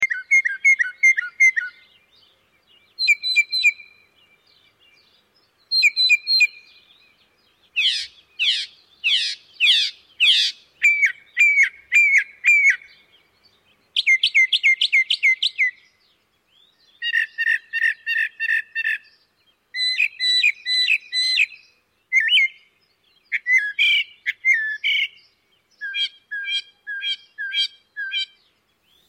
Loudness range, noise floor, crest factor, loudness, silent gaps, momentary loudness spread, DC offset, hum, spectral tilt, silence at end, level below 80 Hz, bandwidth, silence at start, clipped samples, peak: 6 LU; -64 dBFS; 16 dB; -18 LUFS; none; 12 LU; under 0.1%; none; 5.5 dB/octave; 0.85 s; -78 dBFS; 16 kHz; 0 s; under 0.1%; -6 dBFS